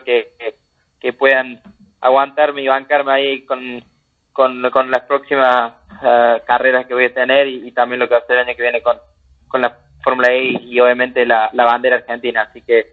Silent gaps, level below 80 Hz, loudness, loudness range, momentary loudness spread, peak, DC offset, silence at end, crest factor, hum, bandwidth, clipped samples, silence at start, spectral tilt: none; -58 dBFS; -14 LUFS; 2 LU; 11 LU; 0 dBFS; under 0.1%; 0.1 s; 16 dB; none; 6.8 kHz; under 0.1%; 0.05 s; -5.5 dB/octave